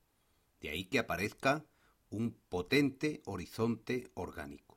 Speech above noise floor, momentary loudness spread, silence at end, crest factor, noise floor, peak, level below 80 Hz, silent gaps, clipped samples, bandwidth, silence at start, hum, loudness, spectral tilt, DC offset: 38 dB; 13 LU; 0.2 s; 20 dB; -74 dBFS; -18 dBFS; -62 dBFS; none; under 0.1%; 16 kHz; 0.6 s; none; -36 LUFS; -5.5 dB/octave; under 0.1%